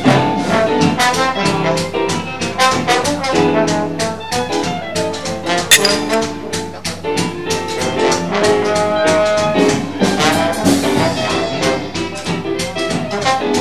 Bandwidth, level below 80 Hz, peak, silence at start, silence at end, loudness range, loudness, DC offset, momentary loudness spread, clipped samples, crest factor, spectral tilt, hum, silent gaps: 14 kHz; -46 dBFS; 0 dBFS; 0 s; 0 s; 2 LU; -15 LUFS; 1%; 7 LU; under 0.1%; 16 dB; -4 dB/octave; none; none